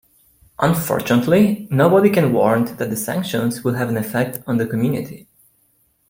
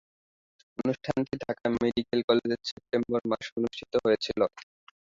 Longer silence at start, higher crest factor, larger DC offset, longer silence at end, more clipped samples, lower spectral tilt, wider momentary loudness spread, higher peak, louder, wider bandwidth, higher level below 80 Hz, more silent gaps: second, 0.6 s vs 0.8 s; about the same, 16 dB vs 20 dB; neither; first, 0.9 s vs 0.5 s; neither; about the same, -6.5 dB/octave vs -6 dB/octave; about the same, 8 LU vs 7 LU; first, -2 dBFS vs -10 dBFS; first, -18 LUFS vs -29 LUFS; first, 16.5 kHz vs 7.6 kHz; first, -54 dBFS vs -62 dBFS; second, none vs 2.24-2.28 s, 2.72-2.77 s, 3.52-3.56 s